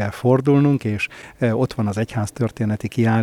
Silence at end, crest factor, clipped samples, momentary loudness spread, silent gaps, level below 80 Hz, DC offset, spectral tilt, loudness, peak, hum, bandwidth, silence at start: 0 s; 16 dB; under 0.1%; 8 LU; none; -50 dBFS; under 0.1%; -7.5 dB/octave; -20 LUFS; -2 dBFS; none; 13.5 kHz; 0 s